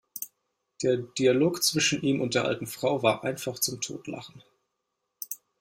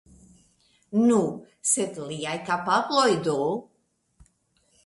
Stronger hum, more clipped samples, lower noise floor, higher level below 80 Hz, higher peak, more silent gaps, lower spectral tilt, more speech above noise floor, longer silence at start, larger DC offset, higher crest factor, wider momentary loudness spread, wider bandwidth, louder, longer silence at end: neither; neither; first, -81 dBFS vs -67 dBFS; about the same, -66 dBFS vs -66 dBFS; about the same, -8 dBFS vs -8 dBFS; neither; about the same, -3.5 dB/octave vs -3.5 dB/octave; first, 54 dB vs 44 dB; second, 0.15 s vs 0.9 s; neither; about the same, 20 dB vs 20 dB; first, 16 LU vs 10 LU; first, 16 kHz vs 11.5 kHz; about the same, -26 LUFS vs -25 LUFS; second, 0.25 s vs 1.2 s